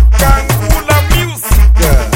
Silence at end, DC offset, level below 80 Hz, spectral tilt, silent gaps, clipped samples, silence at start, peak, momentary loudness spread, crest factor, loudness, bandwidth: 0 s; under 0.1%; -10 dBFS; -4.5 dB/octave; none; 1%; 0 s; 0 dBFS; 4 LU; 8 dB; -11 LUFS; 17 kHz